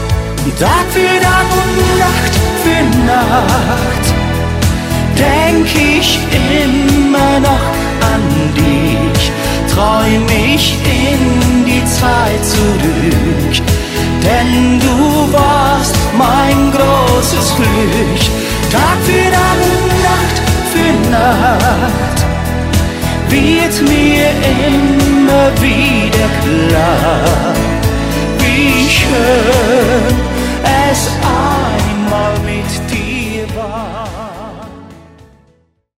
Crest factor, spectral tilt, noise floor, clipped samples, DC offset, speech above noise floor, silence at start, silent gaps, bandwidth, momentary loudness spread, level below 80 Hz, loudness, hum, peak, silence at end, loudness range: 10 dB; -5 dB/octave; -53 dBFS; under 0.1%; under 0.1%; 43 dB; 0 s; none; 16.5 kHz; 5 LU; -20 dBFS; -11 LUFS; none; 0 dBFS; 1 s; 2 LU